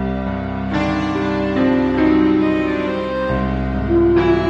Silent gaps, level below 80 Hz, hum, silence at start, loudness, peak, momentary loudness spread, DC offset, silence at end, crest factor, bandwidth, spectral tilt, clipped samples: none; -30 dBFS; none; 0 s; -18 LUFS; -4 dBFS; 8 LU; under 0.1%; 0 s; 12 dB; 7.4 kHz; -8 dB/octave; under 0.1%